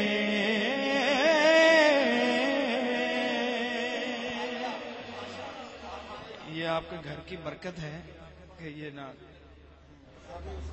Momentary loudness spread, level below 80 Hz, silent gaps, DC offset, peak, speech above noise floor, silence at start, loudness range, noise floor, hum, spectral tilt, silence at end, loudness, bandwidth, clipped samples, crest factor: 21 LU; -56 dBFS; none; under 0.1%; -10 dBFS; 13 dB; 0 s; 18 LU; -54 dBFS; none; -4 dB/octave; 0 s; -26 LUFS; 8.4 kHz; under 0.1%; 18 dB